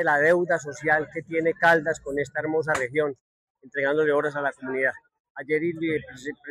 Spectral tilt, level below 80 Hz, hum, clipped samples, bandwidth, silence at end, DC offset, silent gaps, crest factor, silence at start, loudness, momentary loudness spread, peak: -5.5 dB/octave; -62 dBFS; none; under 0.1%; 13 kHz; 0 s; under 0.1%; 3.20-3.55 s, 5.20-5.35 s; 18 dB; 0 s; -24 LUFS; 11 LU; -8 dBFS